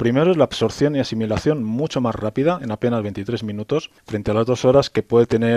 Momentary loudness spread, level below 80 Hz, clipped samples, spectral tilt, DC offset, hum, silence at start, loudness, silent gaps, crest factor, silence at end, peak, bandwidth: 9 LU; -48 dBFS; under 0.1%; -6.5 dB/octave; under 0.1%; none; 0 s; -20 LUFS; none; 16 dB; 0 s; -2 dBFS; 12 kHz